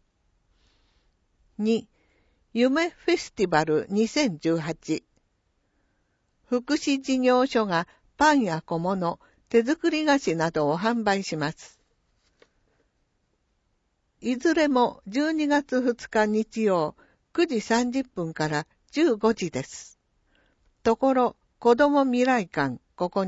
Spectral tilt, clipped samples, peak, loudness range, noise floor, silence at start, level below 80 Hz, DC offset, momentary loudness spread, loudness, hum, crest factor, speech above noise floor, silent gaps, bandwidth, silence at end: -5 dB/octave; under 0.1%; -6 dBFS; 5 LU; -72 dBFS; 1.6 s; -60 dBFS; under 0.1%; 10 LU; -25 LUFS; none; 20 dB; 48 dB; none; 8 kHz; 0 s